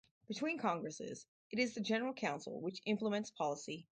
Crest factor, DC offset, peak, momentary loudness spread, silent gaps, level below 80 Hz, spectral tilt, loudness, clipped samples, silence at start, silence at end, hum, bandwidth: 18 dB; under 0.1%; -22 dBFS; 9 LU; 1.28-1.50 s; -82 dBFS; -4.5 dB/octave; -40 LUFS; under 0.1%; 0.3 s; 0.15 s; none; 9.2 kHz